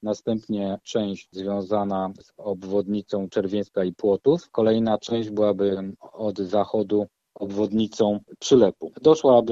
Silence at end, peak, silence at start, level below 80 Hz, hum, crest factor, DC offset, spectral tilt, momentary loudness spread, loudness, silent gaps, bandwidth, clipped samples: 0 s; -4 dBFS; 0 s; -60 dBFS; none; 18 dB; under 0.1%; -6.5 dB/octave; 12 LU; -24 LUFS; none; 8 kHz; under 0.1%